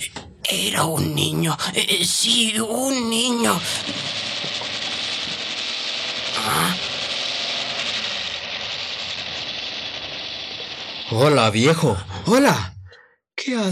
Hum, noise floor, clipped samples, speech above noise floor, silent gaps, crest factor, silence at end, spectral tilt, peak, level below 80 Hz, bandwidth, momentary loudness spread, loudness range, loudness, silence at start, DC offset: none; -50 dBFS; under 0.1%; 31 dB; none; 22 dB; 0 s; -3.5 dB/octave; 0 dBFS; -56 dBFS; 15.5 kHz; 11 LU; 5 LU; -21 LUFS; 0 s; under 0.1%